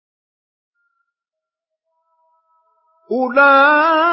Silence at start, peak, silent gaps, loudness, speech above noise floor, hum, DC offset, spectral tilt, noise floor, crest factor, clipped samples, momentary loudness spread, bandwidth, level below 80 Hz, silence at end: 3.1 s; -2 dBFS; none; -12 LUFS; 74 dB; none; under 0.1%; -7.5 dB/octave; -86 dBFS; 16 dB; under 0.1%; 12 LU; 5.8 kHz; -78 dBFS; 0 s